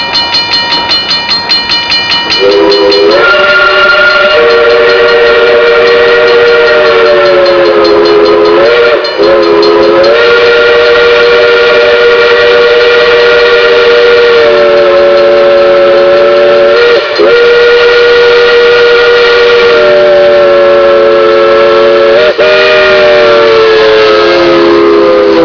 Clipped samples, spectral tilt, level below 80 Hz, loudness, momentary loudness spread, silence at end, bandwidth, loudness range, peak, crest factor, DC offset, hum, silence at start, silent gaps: 9%; -4 dB/octave; -36 dBFS; -3 LUFS; 2 LU; 0 s; 5.4 kHz; 1 LU; 0 dBFS; 4 dB; under 0.1%; none; 0 s; none